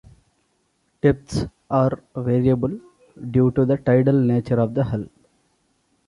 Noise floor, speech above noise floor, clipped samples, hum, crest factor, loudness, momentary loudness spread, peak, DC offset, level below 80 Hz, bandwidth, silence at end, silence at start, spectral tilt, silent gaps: -68 dBFS; 48 dB; under 0.1%; none; 18 dB; -21 LUFS; 10 LU; -4 dBFS; under 0.1%; -46 dBFS; 11 kHz; 1 s; 1.05 s; -9 dB/octave; none